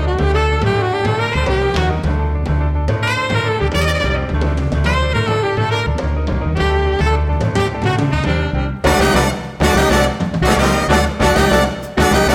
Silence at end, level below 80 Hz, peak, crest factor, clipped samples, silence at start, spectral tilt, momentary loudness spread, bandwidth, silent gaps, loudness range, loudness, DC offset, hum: 0 s; -22 dBFS; 0 dBFS; 14 dB; under 0.1%; 0 s; -5.5 dB/octave; 5 LU; 16.5 kHz; none; 3 LU; -16 LUFS; under 0.1%; none